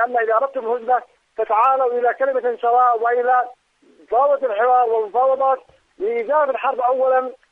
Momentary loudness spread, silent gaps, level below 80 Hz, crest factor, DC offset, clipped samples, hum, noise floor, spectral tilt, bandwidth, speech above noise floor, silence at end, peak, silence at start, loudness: 8 LU; none; -70 dBFS; 14 dB; under 0.1%; under 0.1%; none; -53 dBFS; -5 dB/octave; 3.9 kHz; 35 dB; 0.15 s; -6 dBFS; 0 s; -18 LUFS